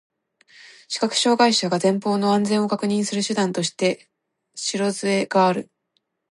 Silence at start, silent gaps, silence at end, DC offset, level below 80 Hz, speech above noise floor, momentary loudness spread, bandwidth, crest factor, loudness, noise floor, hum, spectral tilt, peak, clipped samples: 0.65 s; none; 0.7 s; under 0.1%; -72 dBFS; 52 dB; 10 LU; 11.5 kHz; 18 dB; -21 LUFS; -72 dBFS; none; -4 dB/octave; -4 dBFS; under 0.1%